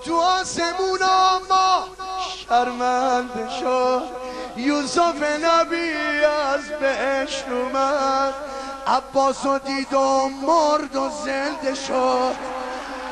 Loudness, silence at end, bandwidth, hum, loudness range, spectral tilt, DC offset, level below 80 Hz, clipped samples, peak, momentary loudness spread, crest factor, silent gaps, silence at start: -21 LUFS; 0 s; 12.5 kHz; none; 2 LU; -2.5 dB/octave; under 0.1%; -52 dBFS; under 0.1%; -6 dBFS; 10 LU; 16 dB; none; 0 s